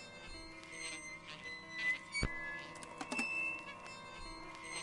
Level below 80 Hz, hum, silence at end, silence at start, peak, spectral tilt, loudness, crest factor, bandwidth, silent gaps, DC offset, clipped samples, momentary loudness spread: -56 dBFS; none; 0 s; 0 s; -18 dBFS; -2.5 dB/octave; -42 LUFS; 26 dB; 11.5 kHz; none; under 0.1%; under 0.1%; 13 LU